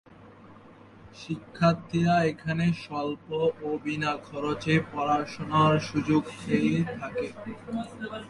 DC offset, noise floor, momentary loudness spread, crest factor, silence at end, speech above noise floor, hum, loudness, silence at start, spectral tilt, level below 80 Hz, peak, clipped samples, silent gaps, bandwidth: under 0.1%; -51 dBFS; 12 LU; 18 dB; 0 s; 24 dB; none; -28 LUFS; 0.1 s; -7 dB/octave; -58 dBFS; -10 dBFS; under 0.1%; none; 11 kHz